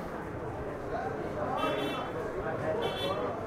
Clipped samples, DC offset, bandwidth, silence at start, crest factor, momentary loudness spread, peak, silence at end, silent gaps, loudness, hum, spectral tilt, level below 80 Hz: under 0.1%; under 0.1%; 16 kHz; 0 s; 14 dB; 7 LU; -20 dBFS; 0 s; none; -34 LUFS; none; -6 dB/octave; -52 dBFS